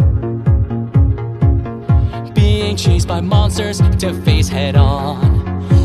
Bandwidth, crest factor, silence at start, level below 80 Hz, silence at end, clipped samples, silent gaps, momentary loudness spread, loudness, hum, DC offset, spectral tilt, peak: 13 kHz; 12 dB; 0 s; -20 dBFS; 0 s; under 0.1%; none; 3 LU; -15 LUFS; none; under 0.1%; -6.5 dB/octave; 0 dBFS